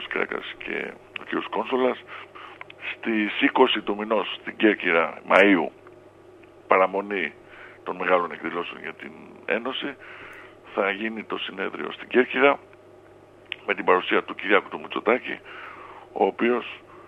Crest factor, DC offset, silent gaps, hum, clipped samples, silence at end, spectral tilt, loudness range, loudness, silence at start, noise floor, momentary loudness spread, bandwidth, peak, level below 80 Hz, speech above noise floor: 26 dB; under 0.1%; none; none; under 0.1%; 0.05 s; -6 dB/octave; 7 LU; -24 LUFS; 0 s; -50 dBFS; 20 LU; 9.2 kHz; 0 dBFS; -68 dBFS; 26 dB